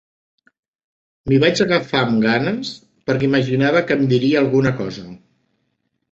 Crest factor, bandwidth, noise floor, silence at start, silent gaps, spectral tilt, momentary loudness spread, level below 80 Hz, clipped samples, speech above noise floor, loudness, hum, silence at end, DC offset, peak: 18 dB; 7.8 kHz; -71 dBFS; 1.25 s; none; -6.5 dB/octave; 14 LU; -52 dBFS; under 0.1%; 54 dB; -17 LUFS; none; 0.95 s; under 0.1%; -2 dBFS